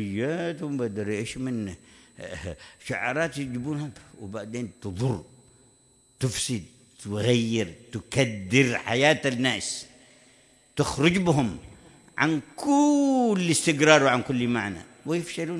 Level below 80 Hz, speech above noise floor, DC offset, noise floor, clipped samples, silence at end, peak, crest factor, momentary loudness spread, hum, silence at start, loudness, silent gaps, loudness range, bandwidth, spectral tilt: -56 dBFS; 35 dB; under 0.1%; -60 dBFS; under 0.1%; 0 s; -2 dBFS; 24 dB; 17 LU; none; 0 s; -25 LUFS; none; 10 LU; 12 kHz; -4.5 dB/octave